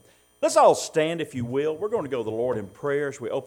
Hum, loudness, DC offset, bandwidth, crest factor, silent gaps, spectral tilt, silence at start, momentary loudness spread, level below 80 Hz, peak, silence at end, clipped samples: none; -24 LUFS; under 0.1%; 16.5 kHz; 20 dB; none; -4.5 dB/octave; 0.4 s; 11 LU; -64 dBFS; -6 dBFS; 0 s; under 0.1%